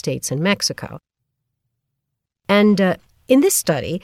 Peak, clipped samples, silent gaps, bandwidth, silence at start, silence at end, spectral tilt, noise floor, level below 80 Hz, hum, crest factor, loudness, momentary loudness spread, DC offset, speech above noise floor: -2 dBFS; under 0.1%; none; 16.5 kHz; 0.05 s; 0.05 s; -4.5 dB/octave; -79 dBFS; -54 dBFS; none; 18 dB; -17 LUFS; 16 LU; under 0.1%; 62 dB